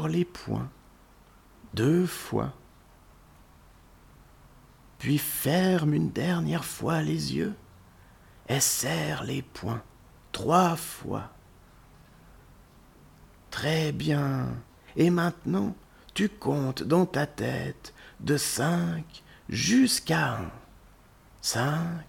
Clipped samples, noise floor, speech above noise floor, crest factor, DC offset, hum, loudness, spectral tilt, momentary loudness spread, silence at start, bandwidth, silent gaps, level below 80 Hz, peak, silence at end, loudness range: under 0.1%; -56 dBFS; 29 dB; 22 dB; under 0.1%; none; -28 LUFS; -5 dB/octave; 14 LU; 0 s; 19 kHz; none; -56 dBFS; -8 dBFS; 0.05 s; 5 LU